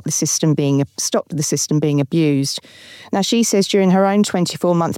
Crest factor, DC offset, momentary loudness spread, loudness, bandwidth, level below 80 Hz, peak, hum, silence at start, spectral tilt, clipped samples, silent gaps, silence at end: 12 dB; under 0.1%; 6 LU; -17 LUFS; 17 kHz; -64 dBFS; -6 dBFS; none; 0.05 s; -4.5 dB/octave; under 0.1%; none; 0 s